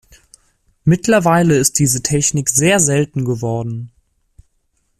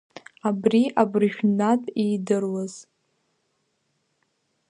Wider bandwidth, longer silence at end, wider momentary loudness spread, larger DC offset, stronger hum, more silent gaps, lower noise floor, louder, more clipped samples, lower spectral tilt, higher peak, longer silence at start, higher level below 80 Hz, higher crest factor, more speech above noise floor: first, 15 kHz vs 10.5 kHz; second, 1.1 s vs 1.9 s; about the same, 9 LU vs 9 LU; neither; neither; neither; second, -64 dBFS vs -73 dBFS; first, -14 LUFS vs -23 LUFS; neither; second, -4.5 dB/octave vs -6.5 dB/octave; first, 0 dBFS vs -4 dBFS; first, 0.85 s vs 0.45 s; first, -46 dBFS vs -72 dBFS; about the same, 16 dB vs 20 dB; about the same, 50 dB vs 50 dB